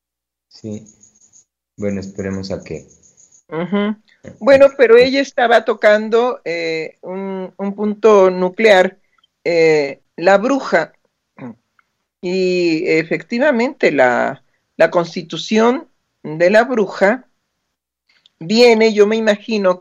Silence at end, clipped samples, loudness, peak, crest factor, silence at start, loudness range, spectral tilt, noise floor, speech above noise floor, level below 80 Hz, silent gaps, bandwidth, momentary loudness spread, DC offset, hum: 0 s; under 0.1%; -15 LUFS; 0 dBFS; 16 dB; 0.65 s; 6 LU; -5 dB/octave; -83 dBFS; 69 dB; -60 dBFS; none; 9.2 kHz; 18 LU; under 0.1%; none